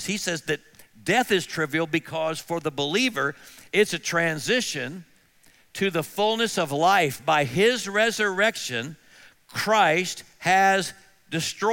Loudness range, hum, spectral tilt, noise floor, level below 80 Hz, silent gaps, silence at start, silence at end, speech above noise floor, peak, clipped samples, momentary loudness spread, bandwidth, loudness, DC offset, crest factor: 3 LU; none; -3.5 dB/octave; -58 dBFS; -66 dBFS; none; 0 s; 0 s; 34 dB; -8 dBFS; under 0.1%; 11 LU; 17 kHz; -24 LUFS; under 0.1%; 18 dB